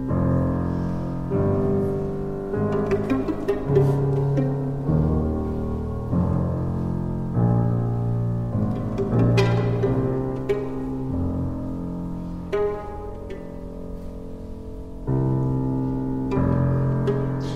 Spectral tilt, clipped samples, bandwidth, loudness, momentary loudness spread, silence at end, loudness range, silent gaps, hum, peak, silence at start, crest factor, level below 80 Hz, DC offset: -9.5 dB/octave; under 0.1%; 7.8 kHz; -24 LUFS; 14 LU; 0 s; 6 LU; none; none; -6 dBFS; 0 s; 16 dB; -36 dBFS; under 0.1%